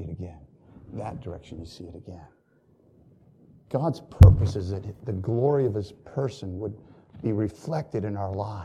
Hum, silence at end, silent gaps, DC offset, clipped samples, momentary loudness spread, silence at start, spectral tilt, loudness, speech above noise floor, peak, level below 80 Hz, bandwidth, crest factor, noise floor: none; 0 s; none; under 0.1%; under 0.1%; 24 LU; 0 s; -9 dB/octave; -25 LUFS; 38 dB; 0 dBFS; -34 dBFS; 7.6 kHz; 26 dB; -62 dBFS